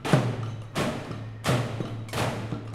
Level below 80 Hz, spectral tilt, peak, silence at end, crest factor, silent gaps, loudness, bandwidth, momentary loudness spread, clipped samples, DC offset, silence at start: -52 dBFS; -6 dB/octave; -4 dBFS; 0 s; 24 dB; none; -30 LUFS; 15.5 kHz; 9 LU; under 0.1%; under 0.1%; 0 s